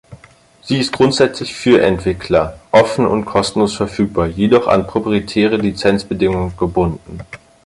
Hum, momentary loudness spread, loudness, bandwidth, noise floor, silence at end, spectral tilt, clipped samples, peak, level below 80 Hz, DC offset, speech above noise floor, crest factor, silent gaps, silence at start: none; 7 LU; -15 LUFS; 11.5 kHz; -46 dBFS; 0.3 s; -6 dB/octave; under 0.1%; 0 dBFS; -36 dBFS; under 0.1%; 32 dB; 14 dB; none; 0.1 s